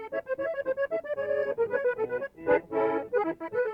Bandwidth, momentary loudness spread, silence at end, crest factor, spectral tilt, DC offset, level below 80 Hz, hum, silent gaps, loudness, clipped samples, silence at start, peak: 5.4 kHz; 5 LU; 0 s; 16 dB; -7.5 dB/octave; under 0.1%; -66 dBFS; none; none; -29 LUFS; under 0.1%; 0 s; -12 dBFS